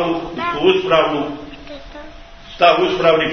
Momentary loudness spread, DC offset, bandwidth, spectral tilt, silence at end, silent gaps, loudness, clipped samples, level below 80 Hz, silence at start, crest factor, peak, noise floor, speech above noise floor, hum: 22 LU; under 0.1%; 6.6 kHz; -5.5 dB/octave; 0 s; none; -16 LUFS; under 0.1%; -42 dBFS; 0 s; 18 dB; 0 dBFS; -37 dBFS; 22 dB; none